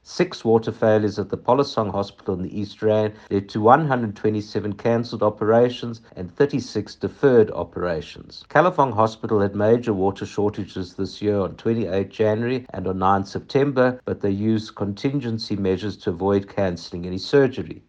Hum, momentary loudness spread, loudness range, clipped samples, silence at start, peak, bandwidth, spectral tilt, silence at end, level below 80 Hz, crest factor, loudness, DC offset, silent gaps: none; 11 LU; 3 LU; under 0.1%; 0.1 s; 0 dBFS; 7.8 kHz; -7 dB/octave; 0.1 s; -56 dBFS; 22 dB; -22 LUFS; under 0.1%; none